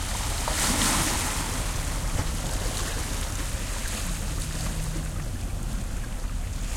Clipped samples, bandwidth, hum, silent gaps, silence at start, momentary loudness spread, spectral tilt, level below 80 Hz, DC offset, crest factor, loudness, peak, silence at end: under 0.1%; 16.5 kHz; none; none; 0 s; 11 LU; -3 dB/octave; -32 dBFS; under 0.1%; 18 dB; -29 LUFS; -10 dBFS; 0 s